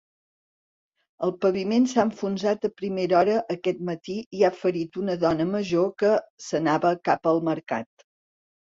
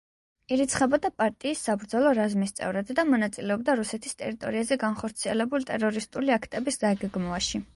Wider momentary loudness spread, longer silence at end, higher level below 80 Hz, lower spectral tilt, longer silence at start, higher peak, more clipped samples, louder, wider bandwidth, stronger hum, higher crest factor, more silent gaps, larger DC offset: about the same, 9 LU vs 7 LU; first, 0.8 s vs 0.1 s; second, -64 dBFS vs -56 dBFS; first, -6 dB/octave vs -4.5 dB/octave; first, 1.2 s vs 0.5 s; first, -6 dBFS vs -10 dBFS; neither; about the same, -25 LUFS vs -27 LUFS; second, 7.8 kHz vs 11.5 kHz; neither; about the same, 18 dB vs 18 dB; first, 4.26-4.31 s, 6.30-6.38 s vs none; neither